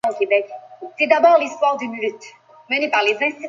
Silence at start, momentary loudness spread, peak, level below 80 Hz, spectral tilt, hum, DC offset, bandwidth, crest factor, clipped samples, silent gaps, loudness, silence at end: 0.05 s; 15 LU; -2 dBFS; -72 dBFS; -3 dB/octave; none; under 0.1%; 7.6 kHz; 18 dB; under 0.1%; none; -18 LUFS; 0 s